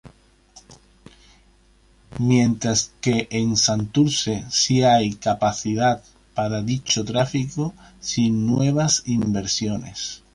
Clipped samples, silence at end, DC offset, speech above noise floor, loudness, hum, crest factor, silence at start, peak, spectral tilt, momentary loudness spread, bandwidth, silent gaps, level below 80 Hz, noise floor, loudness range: under 0.1%; 0.15 s; under 0.1%; 35 dB; -21 LUFS; none; 16 dB; 0.05 s; -6 dBFS; -4.5 dB/octave; 10 LU; 11.5 kHz; none; -50 dBFS; -56 dBFS; 4 LU